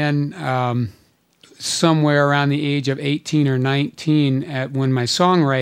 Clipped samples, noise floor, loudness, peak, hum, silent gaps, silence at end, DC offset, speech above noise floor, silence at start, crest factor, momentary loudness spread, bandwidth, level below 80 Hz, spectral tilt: under 0.1%; -54 dBFS; -19 LUFS; -2 dBFS; none; none; 0 s; under 0.1%; 36 dB; 0 s; 16 dB; 7 LU; 14.5 kHz; -64 dBFS; -5.5 dB/octave